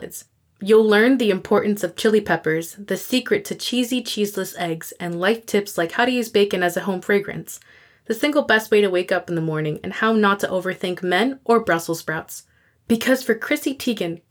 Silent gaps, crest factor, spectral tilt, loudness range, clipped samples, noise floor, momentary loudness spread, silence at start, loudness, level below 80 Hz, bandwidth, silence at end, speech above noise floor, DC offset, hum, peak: none; 16 dB; -4.5 dB/octave; 3 LU; under 0.1%; -42 dBFS; 11 LU; 0 s; -20 LUFS; -62 dBFS; over 20 kHz; 0.15 s; 21 dB; under 0.1%; none; -6 dBFS